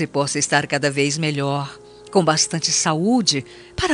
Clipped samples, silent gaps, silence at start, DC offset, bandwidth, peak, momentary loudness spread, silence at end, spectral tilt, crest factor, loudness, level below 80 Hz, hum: under 0.1%; none; 0 s; under 0.1%; 11.5 kHz; -2 dBFS; 8 LU; 0 s; -3.5 dB/octave; 18 dB; -19 LUFS; -48 dBFS; none